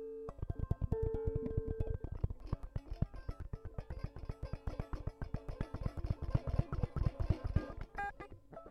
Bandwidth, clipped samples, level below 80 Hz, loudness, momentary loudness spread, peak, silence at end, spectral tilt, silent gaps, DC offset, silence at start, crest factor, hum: 6.4 kHz; under 0.1%; -44 dBFS; -42 LUFS; 10 LU; -20 dBFS; 0 s; -9 dB/octave; none; under 0.1%; 0 s; 20 dB; none